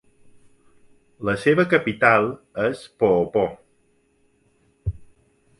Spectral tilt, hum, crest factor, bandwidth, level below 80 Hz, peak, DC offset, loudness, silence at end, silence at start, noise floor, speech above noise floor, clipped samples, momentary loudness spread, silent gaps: -7 dB/octave; none; 22 dB; 11.5 kHz; -46 dBFS; -2 dBFS; under 0.1%; -21 LUFS; 0.55 s; 1.2 s; -63 dBFS; 43 dB; under 0.1%; 15 LU; none